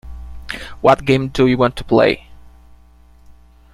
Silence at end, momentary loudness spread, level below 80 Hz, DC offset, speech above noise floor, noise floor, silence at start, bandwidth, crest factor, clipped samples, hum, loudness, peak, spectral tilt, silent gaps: 0.45 s; 16 LU; -38 dBFS; under 0.1%; 32 dB; -46 dBFS; 0.05 s; 13.5 kHz; 18 dB; under 0.1%; none; -15 LUFS; 0 dBFS; -6.5 dB/octave; none